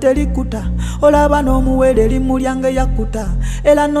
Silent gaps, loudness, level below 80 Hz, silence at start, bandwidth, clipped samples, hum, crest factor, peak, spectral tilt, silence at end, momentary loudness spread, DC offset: none; -15 LUFS; -20 dBFS; 0 s; 13 kHz; under 0.1%; none; 12 dB; 0 dBFS; -7 dB/octave; 0 s; 9 LU; under 0.1%